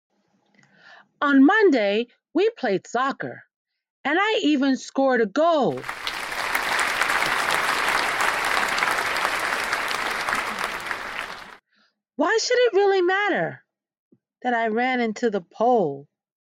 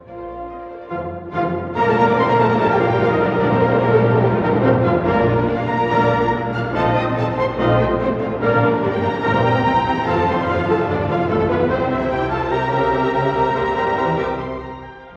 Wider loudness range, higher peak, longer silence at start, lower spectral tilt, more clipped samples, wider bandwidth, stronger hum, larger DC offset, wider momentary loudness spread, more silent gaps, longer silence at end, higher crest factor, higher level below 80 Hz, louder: about the same, 3 LU vs 3 LU; about the same, -4 dBFS vs -2 dBFS; first, 0.9 s vs 0.05 s; second, -3.5 dB/octave vs -8.5 dB/octave; neither; first, 16.5 kHz vs 7 kHz; neither; neither; about the same, 10 LU vs 11 LU; first, 3.56-3.65 s, 3.90-4.04 s, 13.99-14.11 s vs none; first, 0.4 s vs 0 s; about the same, 18 dB vs 14 dB; second, -58 dBFS vs -40 dBFS; second, -22 LUFS vs -18 LUFS